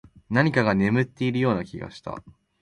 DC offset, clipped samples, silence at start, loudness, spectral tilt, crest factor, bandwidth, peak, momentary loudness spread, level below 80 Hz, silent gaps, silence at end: under 0.1%; under 0.1%; 0.3 s; -23 LUFS; -7.5 dB/octave; 18 dB; 11 kHz; -6 dBFS; 16 LU; -54 dBFS; none; 0.3 s